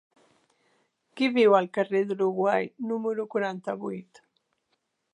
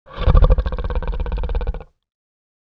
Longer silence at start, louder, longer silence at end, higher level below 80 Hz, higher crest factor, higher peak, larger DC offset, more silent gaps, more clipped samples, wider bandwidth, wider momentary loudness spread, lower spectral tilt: first, 1.15 s vs 0.1 s; second, -26 LUFS vs -21 LUFS; about the same, 1.1 s vs 1 s; second, -82 dBFS vs -20 dBFS; about the same, 20 dB vs 18 dB; second, -8 dBFS vs 0 dBFS; neither; neither; neither; first, 10 kHz vs 5 kHz; about the same, 13 LU vs 12 LU; second, -6.5 dB/octave vs -9.5 dB/octave